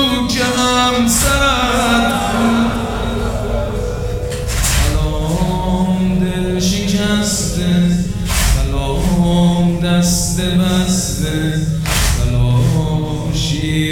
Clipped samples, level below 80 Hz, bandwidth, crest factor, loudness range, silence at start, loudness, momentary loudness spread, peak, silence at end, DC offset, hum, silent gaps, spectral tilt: under 0.1%; -22 dBFS; 17.5 kHz; 14 dB; 3 LU; 0 s; -15 LUFS; 7 LU; -2 dBFS; 0 s; under 0.1%; none; none; -4.5 dB/octave